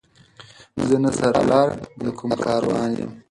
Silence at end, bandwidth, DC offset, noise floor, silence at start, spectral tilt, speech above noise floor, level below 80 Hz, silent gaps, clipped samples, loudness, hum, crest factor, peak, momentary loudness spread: 0.1 s; 11.5 kHz; under 0.1%; -48 dBFS; 0.4 s; -6 dB/octave; 28 dB; -52 dBFS; none; under 0.1%; -21 LUFS; none; 18 dB; -4 dBFS; 12 LU